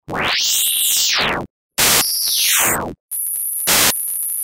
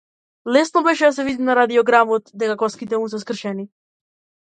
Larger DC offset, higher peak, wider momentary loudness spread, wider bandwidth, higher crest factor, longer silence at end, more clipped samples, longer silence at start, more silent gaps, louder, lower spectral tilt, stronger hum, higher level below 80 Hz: neither; about the same, 0 dBFS vs 0 dBFS; about the same, 10 LU vs 12 LU; first, 16.5 kHz vs 9.2 kHz; about the same, 18 dB vs 18 dB; second, 0 s vs 0.8 s; neither; second, 0.1 s vs 0.45 s; first, 1.50-1.69 s, 3.00-3.08 s vs none; first, -15 LUFS vs -18 LUFS; second, 0 dB/octave vs -4.5 dB/octave; neither; first, -46 dBFS vs -64 dBFS